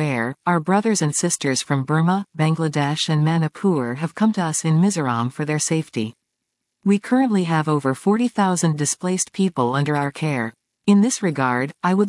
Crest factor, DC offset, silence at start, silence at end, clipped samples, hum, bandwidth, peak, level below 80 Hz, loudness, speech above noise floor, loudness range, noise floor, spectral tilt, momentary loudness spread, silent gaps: 16 dB; under 0.1%; 0 s; 0 s; under 0.1%; none; 12 kHz; -4 dBFS; -72 dBFS; -20 LUFS; 59 dB; 2 LU; -78 dBFS; -5 dB/octave; 5 LU; none